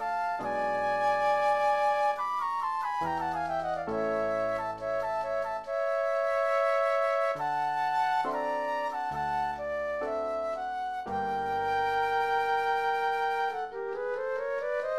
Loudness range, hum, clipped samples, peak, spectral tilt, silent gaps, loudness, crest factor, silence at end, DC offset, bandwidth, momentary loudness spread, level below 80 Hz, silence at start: 3 LU; none; under 0.1%; -16 dBFS; -4.5 dB/octave; none; -30 LUFS; 12 dB; 0 s; 0.1%; 13.5 kHz; 7 LU; -62 dBFS; 0 s